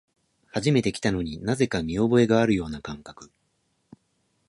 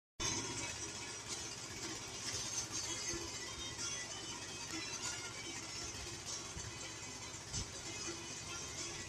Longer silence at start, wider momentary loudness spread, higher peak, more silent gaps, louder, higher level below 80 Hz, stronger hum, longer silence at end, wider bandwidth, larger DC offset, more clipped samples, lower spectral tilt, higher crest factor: first, 0.55 s vs 0.2 s; first, 16 LU vs 5 LU; first, -8 dBFS vs -24 dBFS; neither; first, -24 LUFS vs -42 LUFS; first, -48 dBFS vs -62 dBFS; neither; first, 1.25 s vs 0 s; second, 11.5 kHz vs 14 kHz; neither; neither; first, -6 dB/octave vs -1.5 dB/octave; about the same, 18 dB vs 20 dB